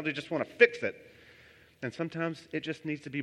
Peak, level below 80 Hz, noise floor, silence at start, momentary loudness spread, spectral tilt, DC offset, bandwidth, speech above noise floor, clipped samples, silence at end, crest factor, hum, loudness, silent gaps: -6 dBFS; -74 dBFS; -58 dBFS; 0 s; 15 LU; -6 dB/octave; under 0.1%; 10.5 kHz; 27 dB; under 0.1%; 0 s; 28 dB; none; -31 LUFS; none